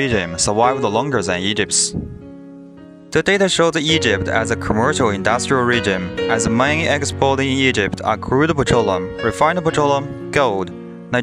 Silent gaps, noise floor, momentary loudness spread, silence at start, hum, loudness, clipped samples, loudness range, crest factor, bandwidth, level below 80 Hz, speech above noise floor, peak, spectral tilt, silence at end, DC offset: none; -39 dBFS; 6 LU; 0 s; none; -17 LUFS; under 0.1%; 2 LU; 16 dB; 14.5 kHz; -42 dBFS; 22 dB; 0 dBFS; -4 dB/octave; 0 s; under 0.1%